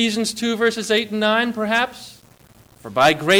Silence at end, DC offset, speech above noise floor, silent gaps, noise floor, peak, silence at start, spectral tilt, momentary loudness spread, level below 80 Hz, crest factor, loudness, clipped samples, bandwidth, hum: 0 s; under 0.1%; 31 dB; none; -50 dBFS; -4 dBFS; 0 s; -3.5 dB/octave; 16 LU; -58 dBFS; 16 dB; -19 LUFS; under 0.1%; over 20 kHz; none